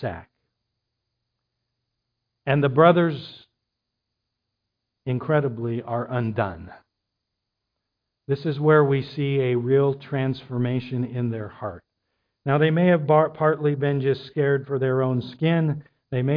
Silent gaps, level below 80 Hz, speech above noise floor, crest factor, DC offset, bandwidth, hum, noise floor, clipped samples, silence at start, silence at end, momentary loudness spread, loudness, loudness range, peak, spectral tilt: none; -60 dBFS; 60 dB; 20 dB; under 0.1%; 5.2 kHz; none; -82 dBFS; under 0.1%; 0 s; 0 s; 15 LU; -23 LUFS; 7 LU; -4 dBFS; -10.5 dB/octave